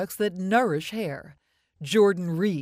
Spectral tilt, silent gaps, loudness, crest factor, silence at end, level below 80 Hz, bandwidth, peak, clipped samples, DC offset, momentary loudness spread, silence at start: -5.5 dB/octave; none; -25 LUFS; 16 dB; 0 s; -66 dBFS; 15.5 kHz; -10 dBFS; under 0.1%; under 0.1%; 13 LU; 0 s